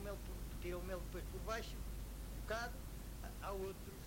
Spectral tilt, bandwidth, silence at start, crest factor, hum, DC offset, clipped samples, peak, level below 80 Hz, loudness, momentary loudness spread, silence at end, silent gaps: -5 dB/octave; 16 kHz; 0 s; 18 dB; none; under 0.1%; under 0.1%; -28 dBFS; -50 dBFS; -48 LUFS; 6 LU; 0 s; none